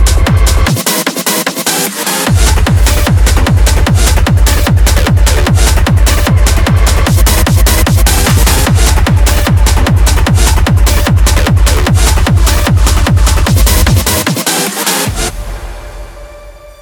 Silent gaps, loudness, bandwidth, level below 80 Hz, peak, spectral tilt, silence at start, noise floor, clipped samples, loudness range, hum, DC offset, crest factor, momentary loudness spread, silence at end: none; -9 LUFS; over 20 kHz; -10 dBFS; 0 dBFS; -4 dB/octave; 0 s; -31 dBFS; under 0.1%; 2 LU; none; under 0.1%; 8 dB; 3 LU; 0.1 s